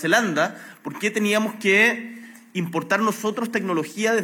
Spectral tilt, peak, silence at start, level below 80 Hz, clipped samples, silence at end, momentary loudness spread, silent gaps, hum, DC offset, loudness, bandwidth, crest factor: -4 dB/octave; -4 dBFS; 0 s; -86 dBFS; under 0.1%; 0 s; 16 LU; none; none; under 0.1%; -22 LUFS; 17.5 kHz; 18 dB